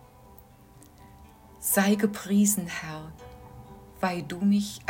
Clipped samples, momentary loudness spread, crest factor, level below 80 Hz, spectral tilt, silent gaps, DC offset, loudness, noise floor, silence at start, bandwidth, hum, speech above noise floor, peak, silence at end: under 0.1%; 25 LU; 18 dB; -58 dBFS; -4.5 dB/octave; none; under 0.1%; -26 LUFS; -53 dBFS; 1 s; 16.5 kHz; none; 27 dB; -10 dBFS; 0 s